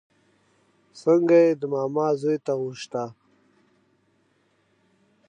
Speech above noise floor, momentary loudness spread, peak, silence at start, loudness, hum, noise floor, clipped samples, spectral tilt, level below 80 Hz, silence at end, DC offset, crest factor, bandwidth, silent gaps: 44 dB; 14 LU; -8 dBFS; 0.95 s; -23 LUFS; none; -66 dBFS; under 0.1%; -7 dB/octave; -80 dBFS; 2.15 s; under 0.1%; 18 dB; 9.4 kHz; none